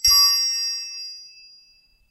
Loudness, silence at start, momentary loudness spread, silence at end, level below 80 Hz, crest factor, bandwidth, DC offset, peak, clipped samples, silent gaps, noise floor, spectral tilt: -17 LUFS; 0.05 s; 21 LU; 0.8 s; -50 dBFS; 18 dB; 14.5 kHz; under 0.1%; -6 dBFS; under 0.1%; none; -57 dBFS; 5 dB/octave